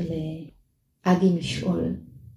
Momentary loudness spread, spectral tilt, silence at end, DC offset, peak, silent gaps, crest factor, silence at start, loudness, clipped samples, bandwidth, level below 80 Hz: 15 LU; -7 dB/octave; 0.05 s; under 0.1%; -8 dBFS; none; 20 dB; 0 s; -25 LUFS; under 0.1%; 11.5 kHz; -50 dBFS